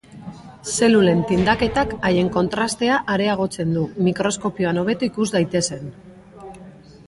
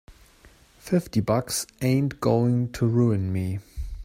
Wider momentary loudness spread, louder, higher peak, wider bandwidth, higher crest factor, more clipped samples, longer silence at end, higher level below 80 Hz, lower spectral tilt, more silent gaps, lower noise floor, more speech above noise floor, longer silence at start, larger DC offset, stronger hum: first, 20 LU vs 7 LU; first, -20 LUFS vs -25 LUFS; first, -2 dBFS vs -8 dBFS; second, 11.5 kHz vs 16 kHz; about the same, 18 dB vs 16 dB; neither; first, 0.35 s vs 0 s; about the same, -44 dBFS vs -44 dBFS; second, -5 dB/octave vs -6.5 dB/octave; neither; second, -42 dBFS vs -54 dBFS; second, 23 dB vs 31 dB; about the same, 0.1 s vs 0.1 s; neither; neither